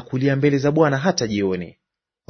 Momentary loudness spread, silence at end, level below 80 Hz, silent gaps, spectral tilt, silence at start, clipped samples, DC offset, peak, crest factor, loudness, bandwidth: 9 LU; 0.6 s; -56 dBFS; none; -6 dB/octave; 0 s; under 0.1%; under 0.1%; -2 dBFS; 18 dB; -20 LUFS; 6.6 kHz